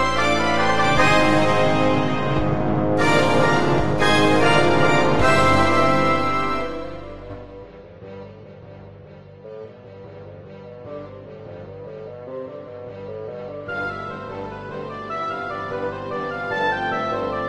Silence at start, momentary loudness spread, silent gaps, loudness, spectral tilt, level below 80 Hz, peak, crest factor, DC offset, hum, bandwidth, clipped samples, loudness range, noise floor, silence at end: 0 s; 23 LU; none; -19 LUFS; -5.5 dB/octave; -40 dBFS; -2 dBFS; 18 dB; under 0.1%; none; 12.5 kHz; under 0.1%; 22 LU; -42 dBFS; 0 s